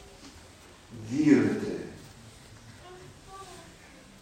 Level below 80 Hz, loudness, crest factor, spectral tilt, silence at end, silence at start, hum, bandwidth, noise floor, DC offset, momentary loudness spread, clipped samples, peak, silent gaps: -60 dBFS; -26 LUFS; 24 dB; -6.5 dB/octave; 0.6 s; 0.2 s; none; 10.5 kHz; -52 dBFS; under 0.1%; 28 LU; under 0.1%; -8 dBFS; none